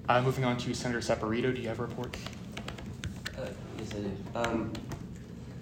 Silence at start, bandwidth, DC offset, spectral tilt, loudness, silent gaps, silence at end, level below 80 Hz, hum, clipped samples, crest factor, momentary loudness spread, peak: 0 s; 16 kHz; under 0.1%; -5.5 dB/octave; -34 LUFS; none; 0 s; -52 dBFS; none; under 0.1%; 22 dB; 12 LU; -12 dBFS